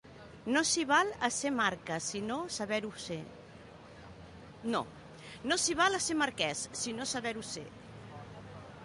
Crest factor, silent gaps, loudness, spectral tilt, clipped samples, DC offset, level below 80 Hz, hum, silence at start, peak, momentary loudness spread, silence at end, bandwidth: 20 dB; none; -33 LUFS; -2.5 dB/octave; under 0.1%; under 0.1%; -64 dBFS; none; 0.05 s; -14 dBFS; 23 LU; 0 s; 11.5 kHz